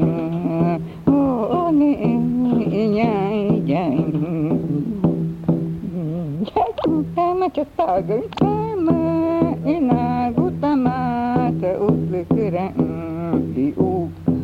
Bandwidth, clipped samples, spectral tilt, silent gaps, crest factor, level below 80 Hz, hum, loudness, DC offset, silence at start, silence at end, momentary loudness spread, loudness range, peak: 5.2 kHz; under 0.1%; -10 dB/octave; none; 14 dB; -48 dBFS; none; -20 LUFS; under 0.1%; 0 s; 0 s; 5 LU; 3 LU; -4 dBFS